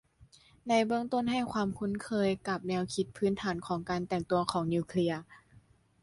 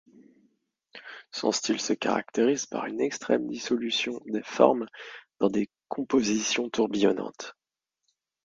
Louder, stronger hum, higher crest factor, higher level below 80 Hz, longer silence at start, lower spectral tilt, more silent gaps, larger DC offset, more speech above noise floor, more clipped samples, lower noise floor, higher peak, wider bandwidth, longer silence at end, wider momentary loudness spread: second, -32 LUFS vs -27 LUFS; neither; about the same, 20 dB vs 24 dB; first, -62 dBFS vs -70 dBFS; second, 0.2 s vs 0.95 s; first, -6 dB/octave vs -3.5 dB/octave; neither; neither; second, 31 dB vs 54 dB; neither; second, -62 dBFS vs -81 dBFS; second, -12 dBFS vs -4 dBFS; first, 11.5 kHz vs 9.4 kHz; second, 0.45 s vs 0.95 s; second, 5 LU vs 16 LU